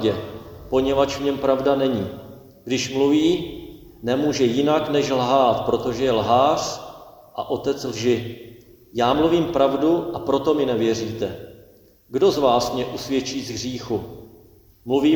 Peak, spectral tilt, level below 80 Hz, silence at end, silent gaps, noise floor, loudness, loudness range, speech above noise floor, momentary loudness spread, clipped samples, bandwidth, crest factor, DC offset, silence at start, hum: -4 dBFS; -5.5 dB/octave; -50 dBFS; 0 s; none; -51 dBFS; -21 LUFS; 3 LU; 31 dB; 16 LU; under 0.1%; 19.5 kHz; 18 dB; under 0.1%; 0 s; none